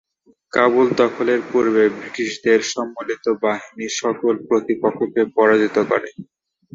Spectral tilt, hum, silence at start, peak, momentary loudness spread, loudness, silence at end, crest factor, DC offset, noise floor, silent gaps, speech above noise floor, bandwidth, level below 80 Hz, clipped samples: -4.5 dB/octave; none; 0.55 s; -2 dBFS; 10 LU; -19 LUFS; 0.5 s; 18 dB; under 0.1%; -46 dBFS; none; 28 dB; 7.8 kHz; -64 dBFS; under 0.1%